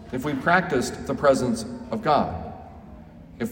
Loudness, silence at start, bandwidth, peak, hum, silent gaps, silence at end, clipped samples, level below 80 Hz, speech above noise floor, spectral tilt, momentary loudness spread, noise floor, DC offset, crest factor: -24 LUFS; 0 s; 16.5 kHz; -4 dBFS; none; none; 0 s; under 0.1%; -48 dBFS; 21 dB; -5.5 dB/octave; 19 LU; -44 dBFS; under 0.1%; 20 dB